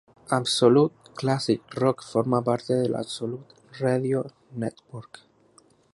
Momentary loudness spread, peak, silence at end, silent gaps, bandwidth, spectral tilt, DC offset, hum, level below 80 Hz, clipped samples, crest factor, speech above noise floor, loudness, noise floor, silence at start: 15 LU; -4 dBFS; 0.9 s; none; 11.5 kHz; -6 dB/octave; under 0.1%; none; -66 dBFS; under 0.1%; 20 dB; 35 dB; -25 LUFS; -59 dBFS; 0.3 s